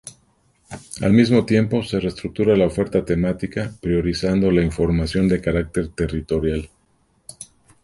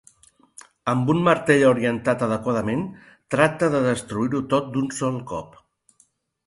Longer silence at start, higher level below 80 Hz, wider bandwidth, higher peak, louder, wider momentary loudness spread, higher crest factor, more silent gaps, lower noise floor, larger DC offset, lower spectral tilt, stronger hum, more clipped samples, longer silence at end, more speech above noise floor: second, 0.05 s vs 0.85 s; first, -36 dBFS vs -56 dBFS; about the same, 11.5 kHz vs 11.5 kHz; about the same, -2 dBFS vs -2 dBFS; about the same, -20 LUFS vs -22 LUFS; first, 22 LU vs 12 LU; about the same, 18 dB vs 20 dB; neither; about the same, -62 dBFS vs -63 dBFS; neither; about the same, -7 dB/octave vs -6 dB/octave; neither; neither; second, 0.4 s vs 1 s; about the same, 43 dB vs 42 dB